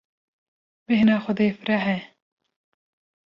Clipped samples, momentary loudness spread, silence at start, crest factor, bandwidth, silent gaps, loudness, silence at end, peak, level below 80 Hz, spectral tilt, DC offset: under 0.1%; 7 LU; 0.9 s; 16 dB; 5.8 kHz; none; -22 LUFS; 1.2 s; -8 dBFS; -64 dBFS; -8 dB/octave; under 0.1%